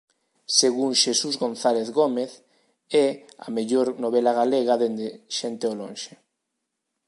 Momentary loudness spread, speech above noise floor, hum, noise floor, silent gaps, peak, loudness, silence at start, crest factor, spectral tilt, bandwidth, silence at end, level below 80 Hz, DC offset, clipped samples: 13 LU; 57 dB; none; -80 dBFS; none; -4 dBFS; -23 LUFS; 0.5 s; 22 dB; -2.5 dB/octave; 11.5 kHz; 1 s; -80 dBFS; under 0.1%; under 0.1%